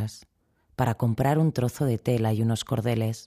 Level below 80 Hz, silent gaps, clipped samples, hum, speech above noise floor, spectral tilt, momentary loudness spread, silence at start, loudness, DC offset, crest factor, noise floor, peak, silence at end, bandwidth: -54 dBFS; none; under 0.1%; none; 42 dB; -7 dB/octave; 5 LU; 0 s; -26 LUFS; under 0.1%; 16 dB; -66 dBFS; -10 dBFS; 0.05 s; 15 kHz